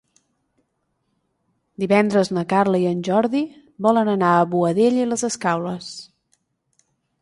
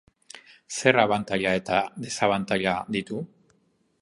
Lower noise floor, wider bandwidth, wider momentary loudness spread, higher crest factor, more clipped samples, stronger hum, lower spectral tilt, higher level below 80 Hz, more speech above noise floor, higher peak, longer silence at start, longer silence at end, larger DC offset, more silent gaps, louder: first, -72 dBFS vs -67 dBFS; about the same, 11.5 kHz vs 11.5 kHz; second, 12 LU vs 20 LU; second, 18 dB vs 24 dB; neither; neither; first, -6 dB/octave vs -4 dB/octave; about the same, -64 dBFS vs -60 dBFS; first, 53 dB vs 43 dB; about the same, -4 dBFS vs -2 dBFS; first, 1.8 s vs 0.7 s; first, 1.15 s vs 0.75 s; neither; neither; first, -20 LUFS vs -25 LUFS